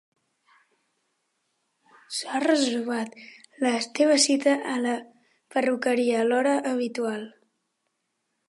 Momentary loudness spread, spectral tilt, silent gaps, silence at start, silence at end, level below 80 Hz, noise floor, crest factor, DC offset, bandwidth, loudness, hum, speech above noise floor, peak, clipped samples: 13 LU; -2.5 dB/octave; none; 2.1 s; 1.2 s; -84 dBFS; -78 dBFS; 20 dB; under 0.1%; 11.5 kHz; -25 LUFS; none; 54 dB; -8 dBFS; under 0.1%